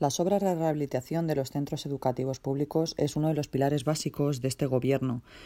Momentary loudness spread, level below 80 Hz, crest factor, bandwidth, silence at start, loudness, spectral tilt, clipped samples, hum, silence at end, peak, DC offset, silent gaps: 5 LU; -58 dBFS; 16 dB; 16 kHz; 0 s; -29 LUFS; -6 dB/octave; under 0.1%; none; 0 s; -12 dBFS; under 0.1%; none